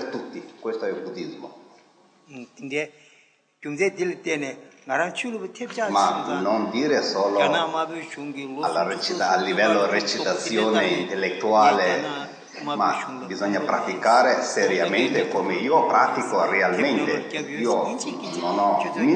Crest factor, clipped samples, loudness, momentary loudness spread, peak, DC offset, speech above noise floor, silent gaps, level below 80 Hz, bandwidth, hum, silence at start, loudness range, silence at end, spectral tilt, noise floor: 18 dB; under 0.1%; -23 LUFS; 14 LU; -4 dBFS; under 0.1%; 37 dB; none; -78 dBFS; 9.8 kHz; none; 0 s; 9 LU; 0 s; -4 dB/octave; -59 dBFS